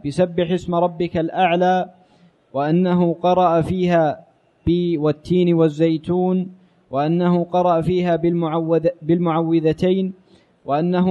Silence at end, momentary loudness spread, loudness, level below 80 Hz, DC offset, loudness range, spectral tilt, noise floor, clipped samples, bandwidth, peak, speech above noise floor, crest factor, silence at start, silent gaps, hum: 0 s; 7 LU; -19 LUFS; -48 dBFS; under 0.1%; 1 LU; -8.5 dB/octave; -54 dBFS; under 0.1%; 9 kHz; -4 dBFS; 36 dB; 14 dB; 0.05 s; none; none